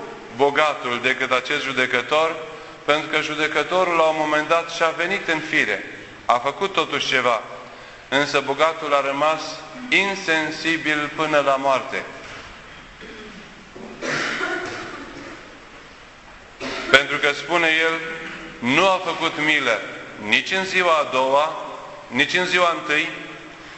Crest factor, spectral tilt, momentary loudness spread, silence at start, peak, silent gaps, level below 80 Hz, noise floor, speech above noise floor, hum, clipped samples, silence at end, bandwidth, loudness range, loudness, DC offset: 22 dB; -3 dB/octave; 19 LU; 0 s; 0 dBFS; none; -56 dBFS; -43 dBFS; 23 dB; none; under 0.1%; 0 s; 9.6 kHz; 9 LU; -20 LUFS; under 0.1%